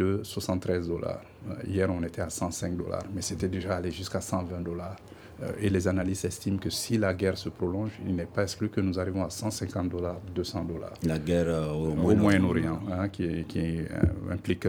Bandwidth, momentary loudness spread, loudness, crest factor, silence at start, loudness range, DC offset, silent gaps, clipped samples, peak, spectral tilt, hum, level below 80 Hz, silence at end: 18.5 kHz; 8 LU; -30 LUFS; 20 dB; 0 s; 5 LU; under 0.1%; none; under 0.1%; -8 dBFS; -6 dB/octave; none; -48 dBFS; 0 s